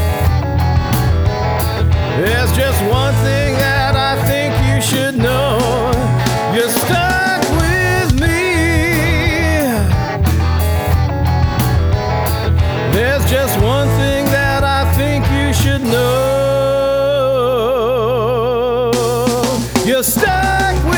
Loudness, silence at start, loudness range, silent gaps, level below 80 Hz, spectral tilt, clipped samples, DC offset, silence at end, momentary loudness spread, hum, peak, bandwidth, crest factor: -14 LUFS; 0 s; 1 LU; none; -22 dBFS; -5.5 dB/octave; under 0.1%; under 0.1%; 0 s; 2 LU; none; 0 dBFS; over 20 kHz; 14 dB